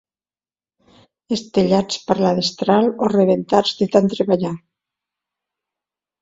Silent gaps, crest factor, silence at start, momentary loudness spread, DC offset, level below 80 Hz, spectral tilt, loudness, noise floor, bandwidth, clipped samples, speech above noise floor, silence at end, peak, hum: none; 20 dB; 1.3 s; 7 LU; under 0.1%; -56 dBFS; -6 dB/octave; -18 LUFS; under -90 dBFS; 7.8 kHz; under 0.1%; over 73 dB; 1.65 s; 0 dBFS; none